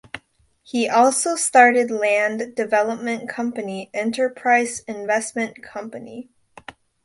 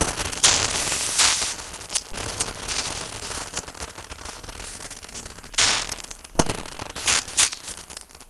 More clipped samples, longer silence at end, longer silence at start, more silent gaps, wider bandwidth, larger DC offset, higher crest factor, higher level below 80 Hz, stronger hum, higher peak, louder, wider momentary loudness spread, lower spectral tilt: neither; first, 0.35 s vs 0.05 s; first, 0.15 s vs 0 s; neither; second, 11.5 kHz vs 16.5 kHz; neither; second, 20 dB vs 26 dB; second, -66 dBFS vs -42 dBFS; neither; about the same, -2 dBFS vs 0 dBFS; about the same, -20 LUFS vs -22 LUFS; about the same, 19 LU vs 18 LU; first, -2.5 dB/octave vs -0.5 dB/octave